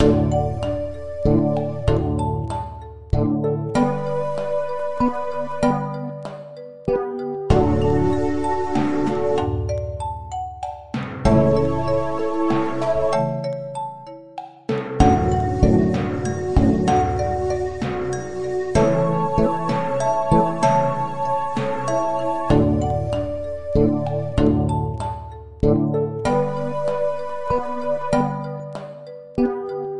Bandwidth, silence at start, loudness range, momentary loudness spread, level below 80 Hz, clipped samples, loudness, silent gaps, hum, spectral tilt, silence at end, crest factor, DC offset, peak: 11 kHz; 0 s; 4 LU; 12 LU; -34 dBFS; under 0.1%; -21 LUFS; none; none; -7.5 dB/octave; 0 s; 20 dB; 1%; 0 dBFS